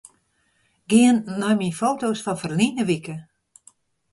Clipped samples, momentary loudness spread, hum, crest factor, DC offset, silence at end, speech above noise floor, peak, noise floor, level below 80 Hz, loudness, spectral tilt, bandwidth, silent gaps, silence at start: under 0.1%; 10 LU; none; 18 dB; under 0.1%; 0.9 s; 46 dB; -4 dBFS; -67 dBFS; -62 dBFS; -21 LUFS; -5 dB/octave; 11.5 kHz; none; 0.9 s